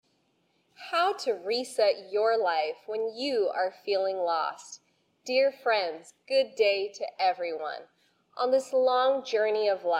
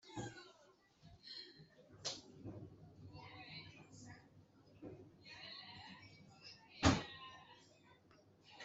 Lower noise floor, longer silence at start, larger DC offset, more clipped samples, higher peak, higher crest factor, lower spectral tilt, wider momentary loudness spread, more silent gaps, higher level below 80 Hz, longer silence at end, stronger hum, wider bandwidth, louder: about the same, -71 dBFS vs -70 dBFS; first, 0.8 s vs 0.05 s; neither; neither; first, -12 dBFS vs -18 dBFS; second, 16 dB vs 30 dB; second, -2 dB/octave vs -4.5 dB/octave; second, 11 LU vs 25 LU; neither; second, -84 dBFS vs -64 dBFS; about the same, 0 s vs 0 s; neither; first, 14 kHz vs 8.2 kHz; first, -28 LUFS vs -45 LUFS